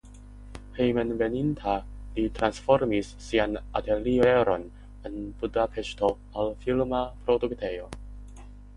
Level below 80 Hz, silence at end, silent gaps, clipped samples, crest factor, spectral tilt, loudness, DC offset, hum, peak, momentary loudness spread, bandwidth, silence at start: -44 dBFS; 0 s; none; under 0.1%; 22 dB; -6.5 dB/octave; -27 LUFS; under 0.1%; 50 Hz at -45 dBFS; -6 dBFS; 19 LU; 11.5 kHz; 0.05 s